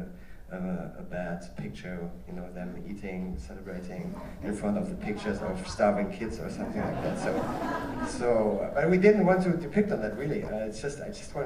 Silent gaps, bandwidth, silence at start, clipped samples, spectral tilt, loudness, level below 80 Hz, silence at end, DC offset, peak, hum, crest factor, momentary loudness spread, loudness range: none; 15 kHz; 0 s; under 0.1%; -7 dB/octave; -30 LUFS; -48 dBFS; 0 s; under 0.1%; -8 dBFS; none; 22 dB; 14 LU; 12 LU